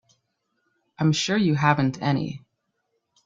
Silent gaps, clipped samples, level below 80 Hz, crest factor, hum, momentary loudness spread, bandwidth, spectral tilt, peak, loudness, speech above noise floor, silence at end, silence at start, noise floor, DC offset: none; under 0.1%; -62 dBFS; 22 dB; none; 10 LU; 7.8 kHz; -5.5 dB/octave; -4 dBFS; -23 LUFS; 54 dB; 0.85 s; 1 s; -76 dBFS; under 0.1%